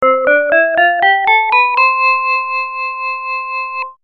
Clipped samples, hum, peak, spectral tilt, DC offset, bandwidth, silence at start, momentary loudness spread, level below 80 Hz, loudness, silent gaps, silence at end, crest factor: under 0.1%; none; 0 dBFS; -3.5 dB/octave; under 0.1%; 6 kHz; 0 s; 10 LU; -62 dBFS; -12 LUFS; none; 0.1 s; 14 dB